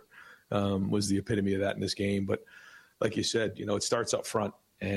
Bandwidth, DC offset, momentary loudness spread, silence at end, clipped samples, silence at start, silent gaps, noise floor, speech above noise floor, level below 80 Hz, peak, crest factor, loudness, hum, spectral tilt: 13.5 kHz; under 0.1%; 6 LU; 0 s; under 0.1%; 0.15 s; none; -55 dBFS; 25 dB; -62 dBFS; -16 dBFS; 16 dB; -31 LUFS; none; -4.5 dB/octave